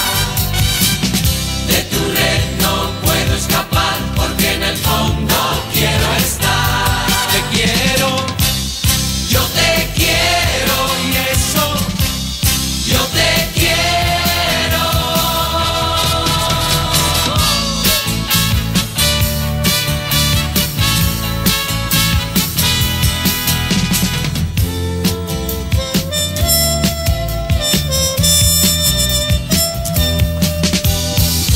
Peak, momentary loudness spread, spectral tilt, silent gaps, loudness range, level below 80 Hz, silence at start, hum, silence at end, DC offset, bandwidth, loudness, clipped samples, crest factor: 0 dBFS; 4 LU; -3 dB/octave; none; 2 LU; -24 dBFS; 0 s; none; 0 s; under 0.1%; 16.5 kHz; -14 LUFS; under 0.1%; 14 dB